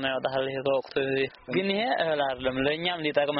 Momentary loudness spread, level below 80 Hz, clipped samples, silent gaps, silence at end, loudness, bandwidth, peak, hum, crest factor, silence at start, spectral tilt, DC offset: 3 LU; -58 dBFS; under 0.1%; none; 0 s; -27 LUFS; 5.8 kHz; -12 dBFS; none; 14 dB; 0 s; -2.5 dB/octave; under 0.1%